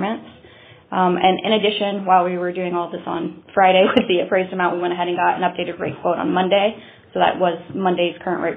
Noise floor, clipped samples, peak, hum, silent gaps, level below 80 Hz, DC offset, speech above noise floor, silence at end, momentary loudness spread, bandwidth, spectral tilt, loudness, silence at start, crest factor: -46 dBFS; under 0.1%; 0 dBFS; none; none; -60 dBFS; under 0.1%; 27 dB; 0 s; 10 LU; 4.5 kHz; -3 dB/octave; -19 LUFS; 0 s; 18 dB